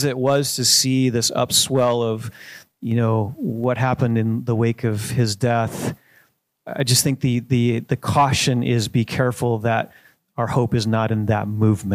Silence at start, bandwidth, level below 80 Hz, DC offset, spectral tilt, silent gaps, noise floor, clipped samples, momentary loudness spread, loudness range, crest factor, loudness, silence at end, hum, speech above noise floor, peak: 0 s; 15.5 kHz; -52 dBFS; under 0.1%; -4.5 dB/octave; none; -59 dBFS; under 0.1%; 10 LU; 3 LU; 18 dB; -20 LUFS; 0 s; none; 40 dB; -2 dBFS